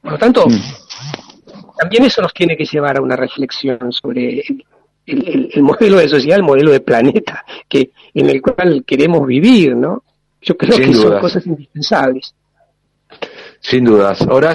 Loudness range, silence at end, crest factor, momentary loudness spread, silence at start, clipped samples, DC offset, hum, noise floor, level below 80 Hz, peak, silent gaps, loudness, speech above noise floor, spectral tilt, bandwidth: 4 LU; 0 s; 12 dB; 18 LU; 0.05 s; under 0.1%; under 0.1%; 50 Hz at -45 dBFS; -59 dBFS; -48 dBFS; 0 dBFS; none; -12 LUFS; 47 dB; -6.5 dB/octave; 11 kHz